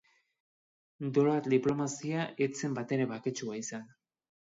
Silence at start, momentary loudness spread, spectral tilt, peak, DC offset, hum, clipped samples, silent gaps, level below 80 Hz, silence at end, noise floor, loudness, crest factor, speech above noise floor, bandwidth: 1 s; 11 LU; -6 dB/octave; -14 dBFS; under 0.1%; none; under 0.1%; none; -74 dBFS; 0.55 s; under -90 dBFS; -32 LUFS; 18 dB; over 58 dB; 7.8 kHz